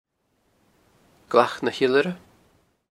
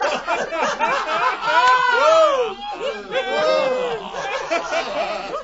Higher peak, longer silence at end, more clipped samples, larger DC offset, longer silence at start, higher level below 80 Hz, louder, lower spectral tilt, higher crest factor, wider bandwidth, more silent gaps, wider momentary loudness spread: about the same, -2 dBFS vs -4 dBFS; first, 0.75 s vs 0 s; neither; neither; first, 1.3 s vs 0 s; second, -68 dBFS vs -54 dBFS; second, -22 LUFS vs -19 LUFS; first, -5.5 dB/octave vs -2 dB/octave; first, 24 dB vs 16 dB; first, 13.5 kHz vs 8 kHz; neither; about the same, 9 LU vs 11 LU